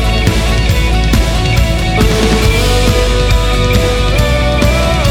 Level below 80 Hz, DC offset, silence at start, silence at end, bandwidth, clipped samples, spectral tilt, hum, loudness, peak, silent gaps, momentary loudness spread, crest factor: -14 dBFS; under 0.1%; 0 s; 0 s; 16 kHz; under 0.1%; -5 dB/octave; none; -12 LUFS; 0 dBFS; none; 2 LU; 10 dB